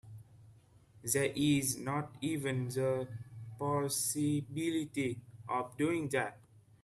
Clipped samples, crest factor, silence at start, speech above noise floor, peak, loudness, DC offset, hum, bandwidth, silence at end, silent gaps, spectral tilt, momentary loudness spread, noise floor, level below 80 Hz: under 0.1%; 22 dB; 0.05 s; 27 dB; -14 dBFS; -35 LUFS; under 0.1%; none; 15.5 kHz; 0.25 s; none; -4.5 dB/octave; 14 LU; -62 dBFS; -68 dBFS